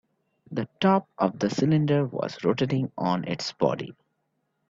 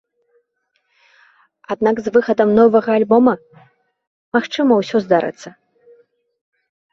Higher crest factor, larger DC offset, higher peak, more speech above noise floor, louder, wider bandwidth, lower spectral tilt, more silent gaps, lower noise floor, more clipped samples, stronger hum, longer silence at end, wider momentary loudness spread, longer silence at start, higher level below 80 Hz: about the same, 20 dB vs 18 dB; neither; second, -8 dBFS vs -2 dBFS; about the same, 51 dB vs 54 dB; second, -26 LUFS vs -16 LUFS; about the same, 7.6 kHz vs 7.4 kHz; about the same, -7 dB/octave vs -6.5 dB/octave; second, none vs 4.07-4.32 s; first, -76 dBFS vs -69 dBFS; neither; neither; second, 0.75 s vs 1.4 s; about the same, 11 LU vs 13 LU; second, 0.5 s vs 1.7 s; about the same, -64 dBFS vs -60 dBFS